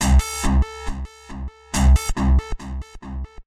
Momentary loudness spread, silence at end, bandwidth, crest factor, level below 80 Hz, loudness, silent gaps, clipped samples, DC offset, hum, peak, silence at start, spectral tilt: 17 LU; 0.05 s; 14.5 kHz; 14 dB; -20 dBFS; -21 LUFS; none; under 0.1%; under 0.1%; none; -6 dBFS; 0 s; -5 dB/octave